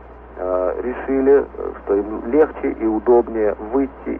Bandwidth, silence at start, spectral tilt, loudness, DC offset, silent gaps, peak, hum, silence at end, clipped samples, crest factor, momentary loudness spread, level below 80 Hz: 3.3 kHz; 0 s; -10.5 dB/octave; -19 LUFS; under 0.1%; none; -4 dBFS; none; 0 s; under 0.1%; 14 dB; 10 LU; -40 dBFS